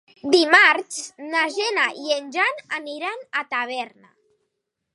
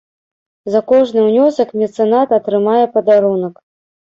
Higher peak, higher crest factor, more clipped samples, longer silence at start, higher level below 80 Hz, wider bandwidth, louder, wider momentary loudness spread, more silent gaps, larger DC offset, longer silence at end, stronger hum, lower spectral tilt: about the same, 0 dBFS vs -2 dBFS; first, 22 dB vs 12 dB; neither; second, 0.25 s vs 0.65 s; second, -76 dBFS vs -62 dBFS; first, 11.5 kHz vs 7.6 kHz; second, -20 LUFS vs -13 LUFS; first, 16 LU vs 6 LU; neither; neither; first, 1.05 s vs 0.6 s; neither; second, -1 dB/octave vs -7.5 dB/octave